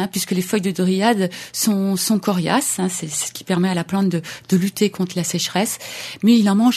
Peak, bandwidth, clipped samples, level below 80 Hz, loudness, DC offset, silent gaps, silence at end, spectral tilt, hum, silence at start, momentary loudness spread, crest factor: -2 dBFS; 14 kHz; under 0.1%; -62 dBFS; -19 LUFS; under 0.1%; none; 0 s; -4.5 dB/octave; none; 0 s; 7 LU; 16 dB